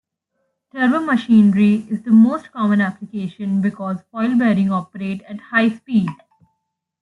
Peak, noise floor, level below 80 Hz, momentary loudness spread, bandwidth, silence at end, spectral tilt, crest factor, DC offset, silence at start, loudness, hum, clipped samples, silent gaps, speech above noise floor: -4 dBFS; -75 dBFS; -62 dBFS; 14 LU; 4.6 kHz; 0.85 s; -8 dB/octave; 14 dB; under 0.1%; 0.75 s; -18 LUFS; none; under 0.1%; none; 58 dB